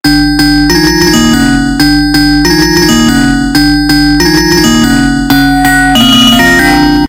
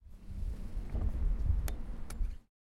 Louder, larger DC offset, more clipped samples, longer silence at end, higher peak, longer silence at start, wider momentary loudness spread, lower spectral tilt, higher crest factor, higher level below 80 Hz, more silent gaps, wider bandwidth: first, -6 LUFS vs -40 LUFS; neither; first, 3% vs under 0.1%; second, 0 s vs 0.3 s; first, 0 dBFS vs -20 dBFS; about the same, 0.05 s vs 0.05 s; second, 4 LU vs 10 LU; second, -3.5 dB/octave vs -6.5 dB/octave; second, 6 dB vs 14 dB; first, -20 dBFS vs -36 dBFS; neither; first, 17.5 kHz vs 13.5 kHz